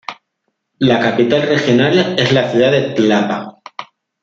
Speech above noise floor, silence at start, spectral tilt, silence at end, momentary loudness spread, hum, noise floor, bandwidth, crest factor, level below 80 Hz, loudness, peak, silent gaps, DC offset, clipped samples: 58 dB; 0.1 s; -6 dB/octave; 0.4 s; 19 LU; none; -71 dBFS; 7.6 kHz; 14 dB; -56 dBFS; -13 LUFS; -2 dBFS; none; under 0.1%; under 0.1%